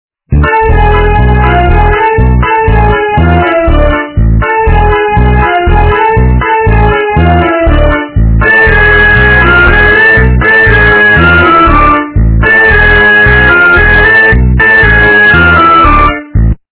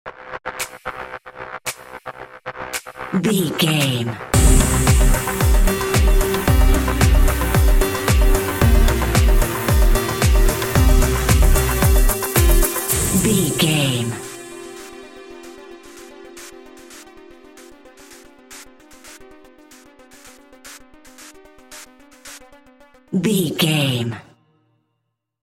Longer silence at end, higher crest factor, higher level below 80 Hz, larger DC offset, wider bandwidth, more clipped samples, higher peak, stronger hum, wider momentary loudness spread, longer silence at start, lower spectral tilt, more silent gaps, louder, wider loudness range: second, 0.2 s vs 1.2 s; second, 4 dB vs 18 dB; first, -10 dBFS vs -20 dBFS; neither; second, 4 kHz vs 17 kHz; first, 7% vs under 0.1%; about the same, 0 dBFS vs 0 dBFS; neither; second, 6 LU vs 23 LU; first, 0.3 s vs 0.05 s; first, -10 dB/octave vs -4.5 dB/octave; neither; first, -5 LUFS vs -18 LUFS; second, 5 LU vs 13 LU